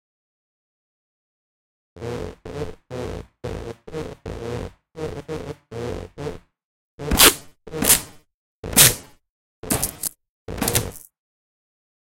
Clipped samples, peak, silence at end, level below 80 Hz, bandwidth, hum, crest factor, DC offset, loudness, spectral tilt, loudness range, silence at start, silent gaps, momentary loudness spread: under 0.1%; 0 dBFS; 1.05 s; -40 dBFS; 17 kHz; none; 26 dB; under 0.1%; -18 LUFS; -2 dB/octave; 17 LU; 1.95 s; 6.64-6.98 s, 8.34-8.63 s, 9.29-9.63 s, 10.29-10.46 s; 22 LU